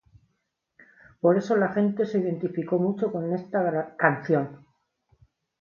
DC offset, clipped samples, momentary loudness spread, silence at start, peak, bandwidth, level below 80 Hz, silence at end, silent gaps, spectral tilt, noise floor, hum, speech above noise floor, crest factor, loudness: under 0.1%; under 0.1%; 6 LU; 1.25 s; -4 dBFS; 7 kHz; -70 dBFS; 1.05 s; none; -8.5 dB/octave; -77 dBFS; none; 52 dB; 24 dB; -25 LUFS